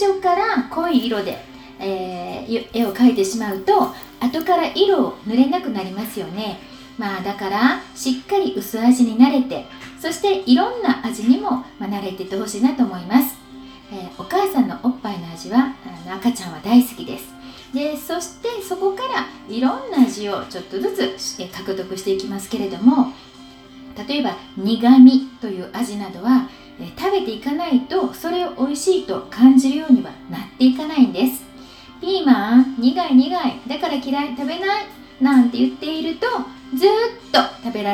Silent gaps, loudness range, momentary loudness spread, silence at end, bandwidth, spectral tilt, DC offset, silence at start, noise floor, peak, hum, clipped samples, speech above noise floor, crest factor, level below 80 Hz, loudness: none; 6 LU; 14 LU; 0 s; 20 kHz; -4.5 dB/octave; under 0.1%; 0 s; -42 dBFS; 0 dBFS; none; under 0.1%; 24 dB; 18 dB; -54 dBFS; -19 LUFS